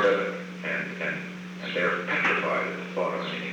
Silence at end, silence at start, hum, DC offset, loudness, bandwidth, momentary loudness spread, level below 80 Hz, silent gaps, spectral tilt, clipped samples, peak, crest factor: 0 s; 0 s; none; under 0.1%; -28 LUFS; 10.5 kHz; 10 LU; -72 dBFS; none; -5.5 dB/octave; under 0.1%; -12 dBFS; 16 dB